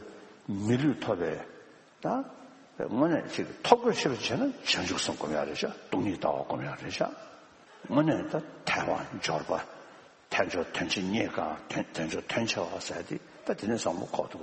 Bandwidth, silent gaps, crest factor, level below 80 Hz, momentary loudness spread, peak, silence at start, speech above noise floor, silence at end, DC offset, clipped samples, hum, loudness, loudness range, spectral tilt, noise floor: 8.4 kHz; none; 28 dB; -64 dBFS; 11 LU; -4 dBFS; 0 s; 23 dB; 0 s; under 0.1%; under 0.1%; none; -31 LUFS; 4 LU; -4.5 dB/octave; -54 dBFS